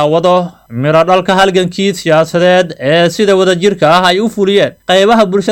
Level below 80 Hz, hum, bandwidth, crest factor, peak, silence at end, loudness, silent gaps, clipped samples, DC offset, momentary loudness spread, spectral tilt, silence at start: -46 dBFS; none; 17 kHz; 10 dB; 0 dBFS; 0 s; -10 LUFS; none; under 0.1%; under 0.1%; 4 LU; -5 dB/octave; 0 s